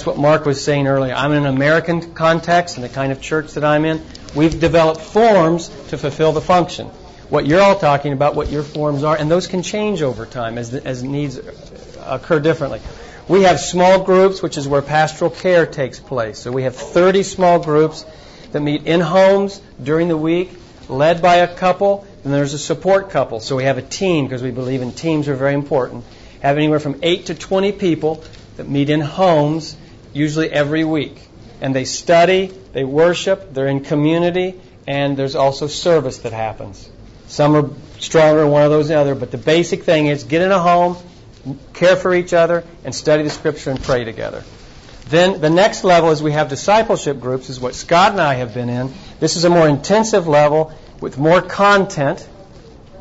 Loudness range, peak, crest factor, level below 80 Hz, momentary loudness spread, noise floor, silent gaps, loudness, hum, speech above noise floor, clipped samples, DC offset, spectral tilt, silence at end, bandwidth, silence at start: 4 LU; -4 dBFS; 12 dB; -42 dBFS; 13 LU; -40 dBFS; none; -16 LUFS; none; 25 dB; under 0.1%; under 0.1%; -5.5 dB/octave; 0 s; 8 kHz; 0 s